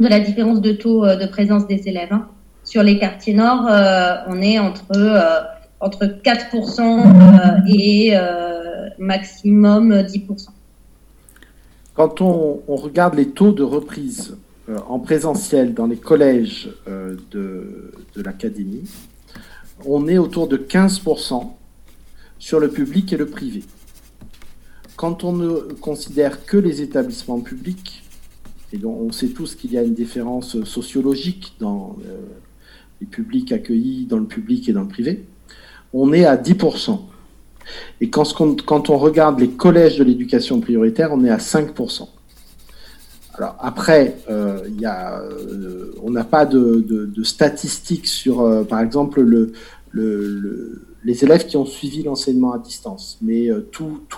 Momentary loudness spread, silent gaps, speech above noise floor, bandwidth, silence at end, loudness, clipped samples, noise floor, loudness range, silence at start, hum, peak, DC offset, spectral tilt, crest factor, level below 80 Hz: 17 LU; none; 32 dB; 13 kHz; 0 s; -16 LUFS; under 0.1%; -47 dBFS; 12 LU; 0 s; none; 0 dBFS; under 0.1%; -6.5 dB/octave; 16 dB; -46 dBFS